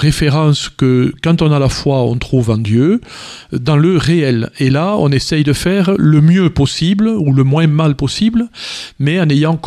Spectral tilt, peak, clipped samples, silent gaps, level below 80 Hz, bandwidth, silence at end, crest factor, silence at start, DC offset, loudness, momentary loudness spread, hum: -6.5 dB/octave; 0 dBFS; under 0.1%; none; -34 dBFS; 13 kHz; 0 s; 12 dB; 0 s; under 0.1%; -13 LUFS; 7 LU; none